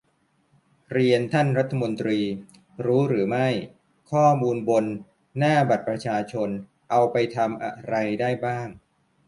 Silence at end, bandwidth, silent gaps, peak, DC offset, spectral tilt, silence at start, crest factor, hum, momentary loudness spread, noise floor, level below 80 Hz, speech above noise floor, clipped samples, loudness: 0.5 s; 11.5 kHz; none; -6 dBFS; under 0.1%; -7 dB/octave; 0.9 s; 18 dB; none; 11 LU; -67 dBFS; -64 dBFS; 44 dB; under 0.1%; -24 LUFS